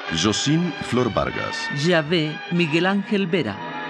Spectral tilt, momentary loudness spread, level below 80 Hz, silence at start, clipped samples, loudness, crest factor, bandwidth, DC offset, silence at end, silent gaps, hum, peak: -5 dB/octave; 5 LU; -50 dBFS; 0 s; under 0.1%; -21 LUFS; 18 dB; 10.5 kHz; under 0.1%; 0 s; none; none; -4 dBFS